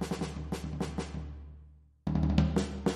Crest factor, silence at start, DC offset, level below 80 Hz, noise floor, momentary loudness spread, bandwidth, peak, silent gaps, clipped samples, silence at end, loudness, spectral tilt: 22 dB; 0 s; under 0.1%; -40 dBFS; -56 dBFS; 17 LU; 13 kHz; -12 dBFS; none; under 0.1%; 0 s; -33 LUFS; -7 dB/octave